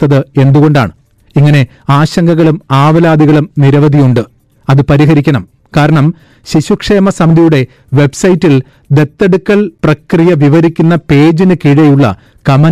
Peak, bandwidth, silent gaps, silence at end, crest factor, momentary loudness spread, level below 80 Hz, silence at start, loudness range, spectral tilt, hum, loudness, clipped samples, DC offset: 0 dBFS; 11 kHz; none; 0 s; 6 dB; 7 LU; -36 dBFS; 0 s; 2 LU; -7.5 dB/octave; none; -8 LUFS; under 0.1%; 0.4%